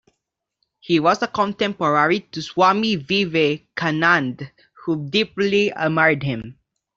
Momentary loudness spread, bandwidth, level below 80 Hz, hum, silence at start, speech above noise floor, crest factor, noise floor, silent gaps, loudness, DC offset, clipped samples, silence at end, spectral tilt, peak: 11 LU; 7.6 kHz; -58 dBFS; none; 0.85 s; 59 dB; 18 dB; -79 dBFS; none; -19 LUFS; under 0.1%; under 0.1%; 0.45 s; -5.5 dB/octave; -2 dBFS